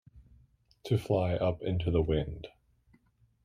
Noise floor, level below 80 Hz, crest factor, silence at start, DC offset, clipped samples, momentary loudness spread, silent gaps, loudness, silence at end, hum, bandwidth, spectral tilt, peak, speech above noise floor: -67 dBFS; -48 dBFS; 18 dB; 0.15 s; under 0.1%; under 0.1%; 18 LU; none; -31 LUFS; 0.95 s; none; 14 kHz; -8 dB/octave; -16 dBFS; 37 dB